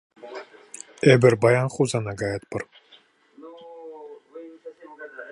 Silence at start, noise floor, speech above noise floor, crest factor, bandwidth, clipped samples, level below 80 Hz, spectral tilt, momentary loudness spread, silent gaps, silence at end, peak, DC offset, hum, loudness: 0.25 s; -56 dBFS; 36 dB; 22 dB; 11.5 kHz; under 0.1%; -60 dBFS; -6 dB/octave; 26 LU; none; 0 s; -2 dBFS; under 0.1%; none; -21 LUFS